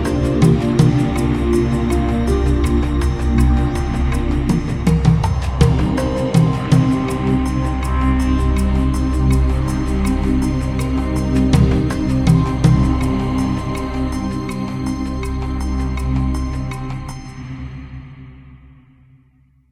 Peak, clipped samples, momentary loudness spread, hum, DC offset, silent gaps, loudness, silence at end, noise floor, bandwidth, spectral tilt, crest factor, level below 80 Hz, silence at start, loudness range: 0 dBFS; under 0.1%; 9 LU; none; under 0.1%; none; -17 LUFS; 1.15 s; -53 dBFS; 13 kHz; -7.5 dB/octave; 16 dB; -22 dBFS; 0 s; 7 LU